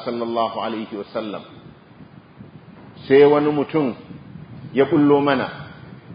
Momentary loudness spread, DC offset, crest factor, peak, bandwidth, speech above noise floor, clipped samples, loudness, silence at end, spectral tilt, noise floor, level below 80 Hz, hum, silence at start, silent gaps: 25 LU; under 0.1%; 20 dB; -2 dBFS; 5.2 kHz; 26 dB; under 0.1%; -19 LUFS; 0 s; -11.5 dB/octave; -44 dBFS; -58 dBFS; none; 0 s; none